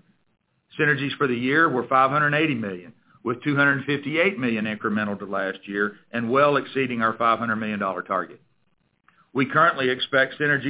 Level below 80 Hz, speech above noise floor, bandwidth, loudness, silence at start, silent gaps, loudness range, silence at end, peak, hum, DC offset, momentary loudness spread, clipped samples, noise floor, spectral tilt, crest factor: -66 dBFS; 46 dB; 4 kHz; -22 LUFS; 0.75 s; none; 3 LU; 0 s; -6 dBFS; none; under 0.1%; 9 LU; under 0.1%; -69 dBFS; -9 dB/octave; 18 dB